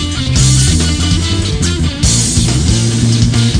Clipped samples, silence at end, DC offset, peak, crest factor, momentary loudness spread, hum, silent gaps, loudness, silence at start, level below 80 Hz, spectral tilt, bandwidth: under 0.1%; 0 s; under 0.1%; 0 dBFS; 10 dB; 5 LU; none; none; -11 LUFS; 0 s; -20 dBFS; -4 dB/octave; 10.5 kHz